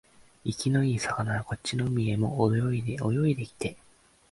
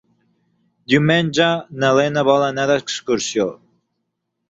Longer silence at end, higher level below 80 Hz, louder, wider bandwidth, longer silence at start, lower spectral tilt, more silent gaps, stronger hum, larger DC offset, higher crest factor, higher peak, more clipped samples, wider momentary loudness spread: second, 0.55 s vs 0.95 s; about the same, -54 dBFS vs -58 dBFS; second, -29 LUFS vs -17 LUFS; first, 11.5 kHz vs 8.2 kHz; second, 0.45 s vs 0.9 s; first, -6.5 dB/octave vs -4.5 dB/octave; neither; neither; neither; about the same, 18 dB vs 18 dB; second, -10 dBFS vs -2 dBFS; neither; first, 10 LU vs 6 LU